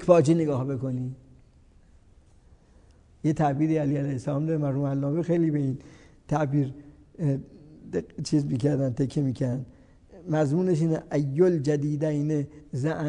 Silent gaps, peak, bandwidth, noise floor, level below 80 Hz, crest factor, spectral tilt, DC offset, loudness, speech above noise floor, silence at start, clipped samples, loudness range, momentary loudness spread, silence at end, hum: none; -4 dBFS; 10 kHz; -56 dBFS; -56 dBFS; 22 dB; -8 dB/octave; under 0.1%; -26 LUFS; 31 dB; 0 s; under 0.1%; 4 LU; 11 LU; 0 s; none